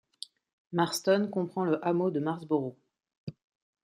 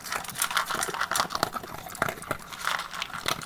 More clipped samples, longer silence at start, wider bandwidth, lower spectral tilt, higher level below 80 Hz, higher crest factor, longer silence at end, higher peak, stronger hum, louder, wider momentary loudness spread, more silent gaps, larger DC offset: neither; first, 0.7 s vs 0 s; second, 16 kHz vs 18 kHz; first, -5.5 dB/octave vs -1.5 dB/octave; second, -76 dBFS vs -56 dBFS; second, 20 dB vs 28 dB; first, 0.55 s vs 0 s; second, -12 dBFS vs -4 dBFS; neither; about the same, -30 LUFS vs -30 LUFS; first, 19 LU vs 8 LU; first, 3.17-3.27 s vs none; neither